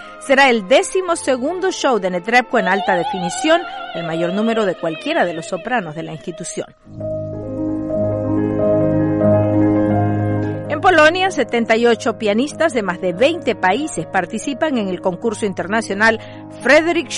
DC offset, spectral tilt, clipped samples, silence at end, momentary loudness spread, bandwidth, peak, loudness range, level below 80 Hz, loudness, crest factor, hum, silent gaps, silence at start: under 0.1%; -5 dB/octave; under 0.1%; 0 s; 13 LU; 11.5 kHz; -2 dBFS; 6 LU; -46 dBFS; -17 LUFS; 16 dB; none; none; 0 s